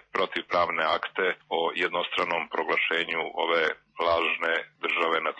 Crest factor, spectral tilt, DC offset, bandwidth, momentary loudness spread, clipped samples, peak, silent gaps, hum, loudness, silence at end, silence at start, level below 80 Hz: 16 dB; -4 dB/octave; under 0.1%; 8.6 kHz; 4 LU; under 0.1%; -12 dBFS; none; none; -26 LUFS; 0 s; 0.15 s; -66 dBFS